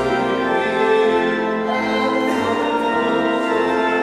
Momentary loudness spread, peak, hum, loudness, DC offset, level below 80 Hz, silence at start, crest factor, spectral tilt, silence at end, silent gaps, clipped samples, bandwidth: 3 LU; -6 dBFS; none; -18 LUFS; under 0.1%; -52 dBFS; 0 s; 12 dB; -5 dB/octave; 0 s; none; under 0.1%; 13 kHz